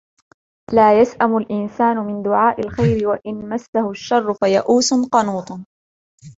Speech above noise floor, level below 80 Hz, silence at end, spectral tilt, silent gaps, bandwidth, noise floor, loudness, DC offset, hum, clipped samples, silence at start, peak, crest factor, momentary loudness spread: over 73 dB; -48 dBFS; 0.1 s; -5 dB/octave; 3.68-3.73 s, 5.66-6.18 s; 8 kHz; under -90 dBFS; -17 LUFS; under 0.1%; none; under 0.1%; 0.7 s; -2 dBFS; 16 dB; 10 LU